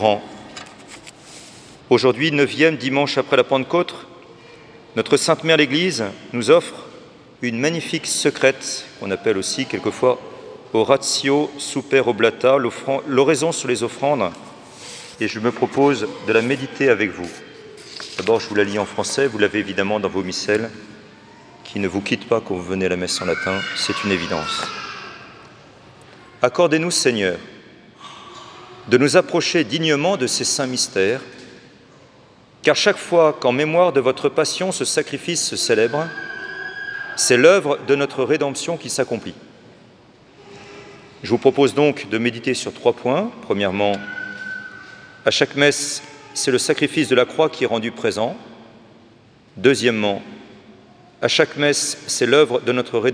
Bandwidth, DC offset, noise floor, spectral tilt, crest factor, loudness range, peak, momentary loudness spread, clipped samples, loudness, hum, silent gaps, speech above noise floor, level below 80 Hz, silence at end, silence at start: 10.5 kHz; under 0.1%; -50 dBFS; -3.5 dB/octave; 20 dB; 4 LU; 0 dBFS; 19 LU; under 0.1%; -19 LUFS; none; none; 31 dB; -62 dBFS; 0 s; 0 s